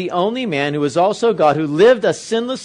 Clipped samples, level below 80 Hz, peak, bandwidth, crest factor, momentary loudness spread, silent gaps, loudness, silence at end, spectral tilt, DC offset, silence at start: under 0.1%; -60 dBFS; -2 dBFS; 10.5 kHz; 14 dB; 7 LU; none; -16 LUFS; 0 s; -5.5 dB/octave; under 0.1%; 0 s